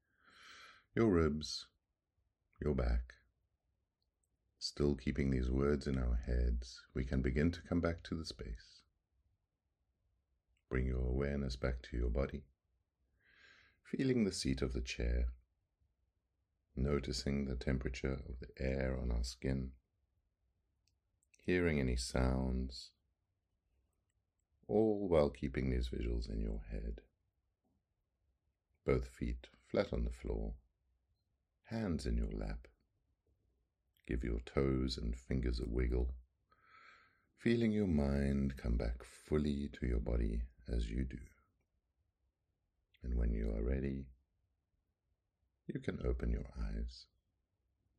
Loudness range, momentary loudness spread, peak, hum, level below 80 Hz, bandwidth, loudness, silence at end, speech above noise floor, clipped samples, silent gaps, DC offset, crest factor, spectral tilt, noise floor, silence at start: 7 LU; 13 LU; -18 dBFS; none; -44 dBFS; 11 kHz; -39 LUFS; 0.95 s; 49 dB; under 0.1%; none; under 0.1%; 22 dB; -6.5 dB/octave; -86 dBFS; 0.4 s